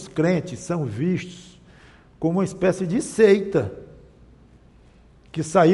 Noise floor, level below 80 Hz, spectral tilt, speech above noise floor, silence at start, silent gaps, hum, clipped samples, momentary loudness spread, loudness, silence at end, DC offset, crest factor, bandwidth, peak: -52 dBFS; -54 dBFS; -6.5 dB/octave; 31 dB; 0 s; none; none; under 0.1%; 16 LU; -22 LUFS; 0 s; under 0.1%; 18 dB; 11.5 kHz; -4 dBFS